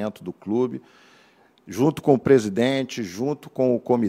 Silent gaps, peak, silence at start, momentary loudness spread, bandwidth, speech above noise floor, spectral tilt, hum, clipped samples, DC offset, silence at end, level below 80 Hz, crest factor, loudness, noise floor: none; -2 dBFS; 0 s; 13 LU; 15.5 kHz; 34 dB; -6.5 dB/octave; none; under 0.1%; under 0.1%; 0 s; -62 dBFS; 20 dB; -22 LUFS; -57 dBFS